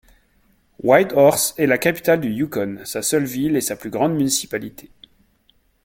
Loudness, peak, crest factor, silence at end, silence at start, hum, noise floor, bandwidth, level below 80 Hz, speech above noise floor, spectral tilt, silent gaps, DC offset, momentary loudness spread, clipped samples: -19 LUFS; 0 dBFS; 20 dB; 1.05 s; 0.85 s; none; -61 dBFS; 17 kHz; -56 dBFS; 42 dB; -4 dB/octave; none; under 0.1%; 11 LU; under 0.1%